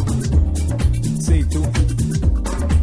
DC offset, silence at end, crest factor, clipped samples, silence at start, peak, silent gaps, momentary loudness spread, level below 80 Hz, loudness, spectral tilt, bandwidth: under 0.1%; 0 s; 10 dB; under 0.1%; 0 s; -6 dBFS; none; 2 LU; -20 dBFS; -19 LUFS; -6.5 dB/octave; 11 kHz